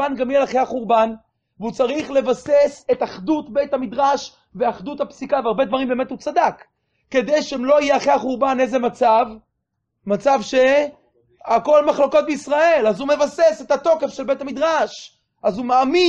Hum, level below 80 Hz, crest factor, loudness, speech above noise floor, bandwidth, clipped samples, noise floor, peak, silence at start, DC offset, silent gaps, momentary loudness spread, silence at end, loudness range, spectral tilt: none; -56 dBFS; 16 dB; -19 LUFS; 57 dB; 9 kHz; under 0.1%; -75 dBFS; -4 dBFS; 0 s; under 0.1%; none; 9 LU; 0 s; 4 LU; -4.5 dB/octave